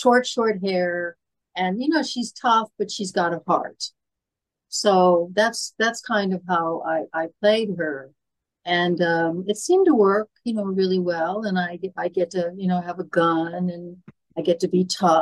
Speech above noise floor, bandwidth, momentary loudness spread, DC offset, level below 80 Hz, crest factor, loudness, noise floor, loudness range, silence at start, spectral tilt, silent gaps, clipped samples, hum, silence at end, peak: 64 dB; 12.5 kHz; 10 LU; under 0.1%; -74 dBFS; 16 dB; -22 LUFS; -86 dBFS; 3 LU; 0 s; -5 dB/octave; none; under 0.1%; none; 0 s; -6 dBFS